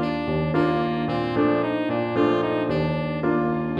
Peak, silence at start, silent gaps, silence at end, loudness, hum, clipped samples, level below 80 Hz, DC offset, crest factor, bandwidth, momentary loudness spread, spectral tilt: -8 dBFS; 0 s; none; 0 s; -23 LUFS; none; under 0.1%; -46 dBFS; under 0.1%; 14 dB; 7 kHz; 3 LU; -8.5 dB/octave